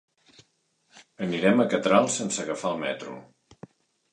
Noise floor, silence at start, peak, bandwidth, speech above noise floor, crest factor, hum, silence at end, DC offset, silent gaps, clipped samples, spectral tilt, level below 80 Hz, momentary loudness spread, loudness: -70 dBFS; 0.95 s; -6 dBFS; 11 kHz; 45 dB; 22 dB; none; 0.9 s; under 0.1%; none; under 0.1%; -4.5 dB/octave; -70 dBFS; 14 LU; -25 LUFS